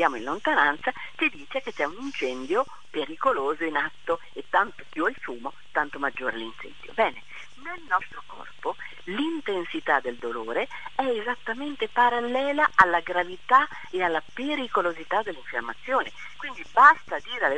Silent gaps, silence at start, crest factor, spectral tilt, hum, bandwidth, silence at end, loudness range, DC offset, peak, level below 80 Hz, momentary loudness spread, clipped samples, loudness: none; 0 s; 26 dB; -4 dB/octave; none; 10 kHz; 0 s; 7 LU; 1%; 0 dBFS; -62 dBFS; 15 LU; under 0.1%; -26 LUFS